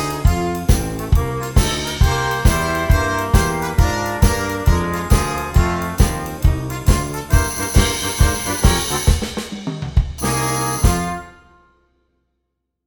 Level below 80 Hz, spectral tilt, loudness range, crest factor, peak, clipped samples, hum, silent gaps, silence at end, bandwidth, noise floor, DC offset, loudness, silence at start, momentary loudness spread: -20 dBFS; -4.5 dB/octave; 3 LU; 18 dB; 0 dBFS; under 0.1%; none; none; 1.55 s; over 20 kHz; -74 dBFS; under 0.1%; -18 LUFS; 0 s; 4 LU